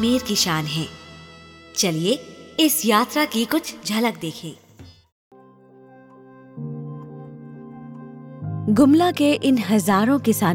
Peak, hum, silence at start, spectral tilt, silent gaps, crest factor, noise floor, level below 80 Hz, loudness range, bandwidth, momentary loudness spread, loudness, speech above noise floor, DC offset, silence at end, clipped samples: -4 dBFS; none; 0 s; -4 dB/octave; 5.12-5.31 s; 18 dB; -49 dBFS; -60 dBFS; 18 LU; 18 kHz; 22 LU; -20 LUFS; 29 dB; under 0.1%; 0 s; under 0.1%